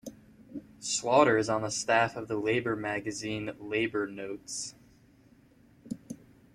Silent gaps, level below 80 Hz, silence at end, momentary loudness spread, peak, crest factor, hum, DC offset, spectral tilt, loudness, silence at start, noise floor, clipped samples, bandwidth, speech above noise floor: none; -66 dBFS; 0.4 s; 22 LU; -8 dBFS; 24 dB; none; under 0.1%; -3.5 dB/octave; -30 LUFS; 0.05 s; -60 dBFS; under 0.1%; 14.5 kHz; 31 dB